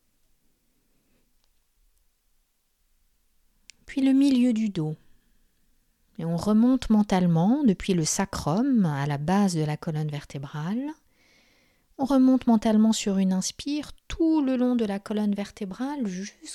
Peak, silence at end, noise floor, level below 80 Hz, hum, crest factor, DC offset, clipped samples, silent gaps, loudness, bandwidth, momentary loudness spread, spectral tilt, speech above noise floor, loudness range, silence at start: -10 dBFS; 0 s; -70 dBFS; -52 dBFS; none; 16 dB; under 0.1%; under 0.1%; none; -24 LUFS; 14 kHz; 12 LU; -6 dB/octave; 46 dB; 4 LU; 3.9 s